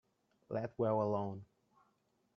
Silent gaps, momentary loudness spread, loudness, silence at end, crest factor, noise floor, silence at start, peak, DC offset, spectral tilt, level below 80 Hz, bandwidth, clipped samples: none; 10 LU; -38 LUFS; 0.9 s; 18 dB; -78 dBFS; 0.5 s; -22 dBFS; under 0.1%; -8.5 dB/octave; -78 dBFS; 6.4 kHz; under 0.1%